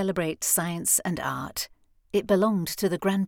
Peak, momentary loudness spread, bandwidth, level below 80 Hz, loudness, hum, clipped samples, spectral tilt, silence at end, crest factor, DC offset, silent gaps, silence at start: -10 dBFS; 9 LU; 19.5 kHz; -58 dBFS; -25 LUFS; none; under 0.1%; -4 dB/octave; 0 s; 16 dB; under 0.1%; none; 0 s